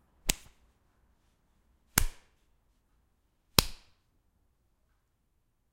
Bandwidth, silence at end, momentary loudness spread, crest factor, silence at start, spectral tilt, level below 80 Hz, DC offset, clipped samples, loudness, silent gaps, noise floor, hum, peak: 16.5 kHz; 2 s; 16 LU; 36 dB; 0.25 s; -2 dB/octave; -44 dBFS; under 0.1%; under 0.1%; -30 LUFS; none; -74 dBFS; none; 0 dBFS